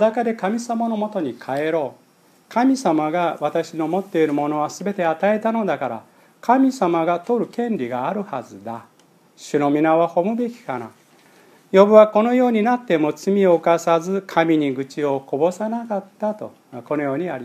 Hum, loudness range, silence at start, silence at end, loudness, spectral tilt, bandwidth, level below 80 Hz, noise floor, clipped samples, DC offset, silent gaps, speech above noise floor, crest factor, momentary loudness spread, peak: none; 6 LU; 0 s; 0 s; -20 LUFS; -6.5 dB/octave; 14.5 kHz; -78 dBFS; -52 dBFS; under 0.1%; under 0.1%; none; 33 dB; 20 dB; 12 LU; 0 dBFS